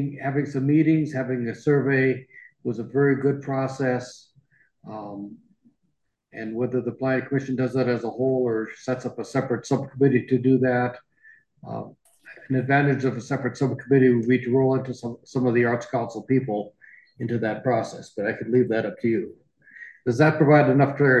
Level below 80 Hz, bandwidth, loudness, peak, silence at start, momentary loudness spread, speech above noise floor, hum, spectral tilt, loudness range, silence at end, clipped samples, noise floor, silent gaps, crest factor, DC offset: -64 dBFS; 9 kHz; -23 LUFS; -6 dBFS; 0 s; 16 LU; 52 dB; none; -8 dB/octave; 6 LU; 0 s; under 0.1%; -74 dBFS; none; 18 dB; under 0.1%